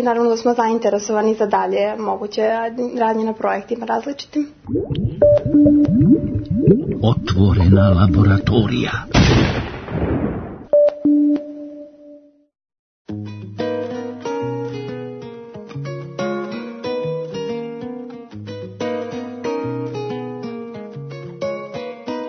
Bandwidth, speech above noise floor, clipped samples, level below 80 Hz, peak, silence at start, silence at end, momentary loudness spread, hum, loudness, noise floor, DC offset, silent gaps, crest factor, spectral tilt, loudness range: 6.6 kHz; 29 dB; under 0.1%; -38 dBFS; 0 dBFS; 0 s; 0 s; 18 LU; none; -18 LUFS; -44 dBFS; under 0.1%; 12.79-13.05 s; 18 dB; -7.5 dB/octave; 12 LU